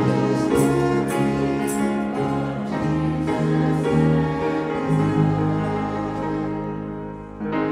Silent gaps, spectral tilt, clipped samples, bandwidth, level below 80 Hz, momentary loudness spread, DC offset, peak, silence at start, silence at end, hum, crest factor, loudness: none; -7.5 dB/octave; under 0.1%; 15.5 kHz; -44 dBFS; 8 LU; under 0.1%; -6 dBFS; 0 s; 0 s; none; 16 dB; -22 LUFS